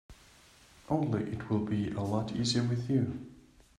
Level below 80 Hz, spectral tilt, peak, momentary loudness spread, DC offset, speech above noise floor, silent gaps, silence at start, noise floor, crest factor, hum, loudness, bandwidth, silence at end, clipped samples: -60 dBFS; -6 dB/octave; -16 dBFS; 6 LU; under 0.1%; 28 dB; none; 0.1 s; -59 dBFS; 18 dB; none; -32 LUFS; 11.5 kHz; 0.4 s; under 0.1%